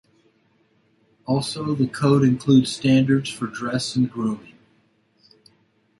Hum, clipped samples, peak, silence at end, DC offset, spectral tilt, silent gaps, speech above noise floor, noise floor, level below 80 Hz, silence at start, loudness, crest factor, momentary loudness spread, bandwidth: none; under 0.1%; -4 dBFS; 1.6 s; under 0.1%; -6 dB/octave; none; 43 dB; -63 dBFS; -60 dBFS; 1.3 s; -21 LUFS; 18 dB; 11 LU; 11.5 kHz